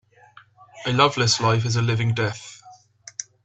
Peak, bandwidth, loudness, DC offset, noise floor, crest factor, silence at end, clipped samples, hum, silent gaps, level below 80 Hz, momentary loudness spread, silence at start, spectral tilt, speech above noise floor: -2 dBFS; 8.2 kHz; -21 LUFS; under 0.1%; -52 dBFS; 22 dB; 0.2 s; under 0.1%; none; none; -58 dBFS; 17 LU; 0.75 s; -4 dB/octave; 31 dB